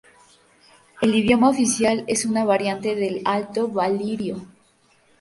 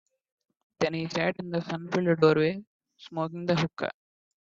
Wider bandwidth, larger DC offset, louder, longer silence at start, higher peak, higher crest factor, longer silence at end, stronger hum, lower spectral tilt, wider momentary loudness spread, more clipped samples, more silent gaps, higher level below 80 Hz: first, 11.5 kHz vs 7.6 kHz; neither; first, -21 LUFS vs -28 LUFS; first, 0.95 s vs 0.8 s; first, -4 dBFS vs -8 dBFS; about the same, 18 dB vs 22 dB; first, 0.75 s vs 0.5 s; neither; second, -4 dB/octave vs -6.5 dB/octave; second, 8 LU vs 13 LU; neither; second, none vs 2.67-2.80 s; first, -56 dBFS vs -66 dBFS